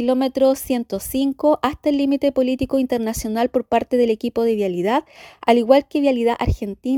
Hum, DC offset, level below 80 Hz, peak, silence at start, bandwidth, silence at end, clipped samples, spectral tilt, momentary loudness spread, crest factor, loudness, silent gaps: none; under 0.1%; -38 dBFS; 0 dBFS; 0 s; 19 kHz; 0 s; under 0.1%; -5.5 dB/octave; 7 LU; 18 dB; -19 LUFS; none